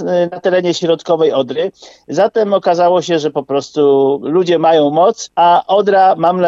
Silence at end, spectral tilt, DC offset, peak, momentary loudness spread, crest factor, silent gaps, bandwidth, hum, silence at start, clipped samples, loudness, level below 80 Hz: 0 s; -5.5 dB/octave; under 0.1%; -2 dBFS; 7 LU; 10 dB; none; 7.8 kHz; none; 0 s; under 0.1%; -13 LUFS; -64 dBFS